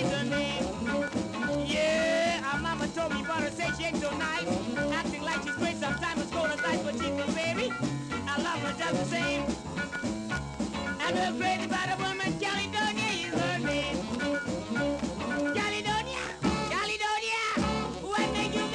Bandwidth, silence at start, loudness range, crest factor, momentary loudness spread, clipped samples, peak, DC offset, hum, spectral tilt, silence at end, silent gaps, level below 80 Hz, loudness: 12 kHz; 0 s; 2 LU; 16 dB; 4 LU; under 0.1%; -16 dBFS; under 0.1%; none; -4 dB/octave; 0 s; none; -50 dBFS; -30 LUFS